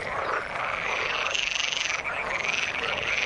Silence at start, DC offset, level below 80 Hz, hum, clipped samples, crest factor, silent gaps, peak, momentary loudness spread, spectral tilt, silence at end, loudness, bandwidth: 0 s; under 0.1%; -54 dBFS; none; under 0.1%; 20 dB; none; -8 dBFS; 4 LU; -1 dB/octave; 0 s; -26 LUFS; 11.5 kHz